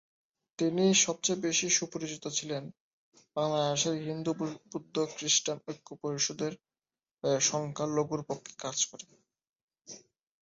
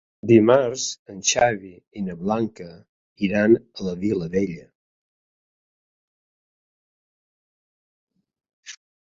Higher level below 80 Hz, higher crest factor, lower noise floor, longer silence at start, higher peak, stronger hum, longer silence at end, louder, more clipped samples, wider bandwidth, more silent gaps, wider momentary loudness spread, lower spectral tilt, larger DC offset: second, -74 dBFS vs -56 dBFS; about the same, 20 dB vs 22 dB; about the same, under -90 dBFS vs under -90 dBFS; first, 0.6 s vs 0.25 s; second, -12 dBFS vs -2 dBFS; neither; about the same, 0.45 s vs 0.45 s; second, -31 LUFS vs -21 LUFS; neither; about the same, 8 kHz vs 7.8 kHz; second, 2.80-3.12 s, 7.11-7.15 s, 9.49-9.68 s vs 0.99-1.06 s, 1.87-1.91 s, 2.89-3.16 s, 4.75-8.07 s, 8.53-8.63 s; second, 15 LU vs 24 LU; second, -3 dB/octave vs -4.5 dB/octave; neither